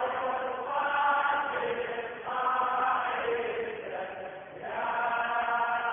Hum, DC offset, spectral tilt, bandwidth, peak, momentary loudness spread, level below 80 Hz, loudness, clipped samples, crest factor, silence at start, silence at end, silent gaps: none; under 0.1%; -7 dB/octave; 3.7 kHz; -16 dBFS; 10 LU; -68 dBFS; -30 LUFS; under 0.1%; 14 dB; 0 s; 0 s; none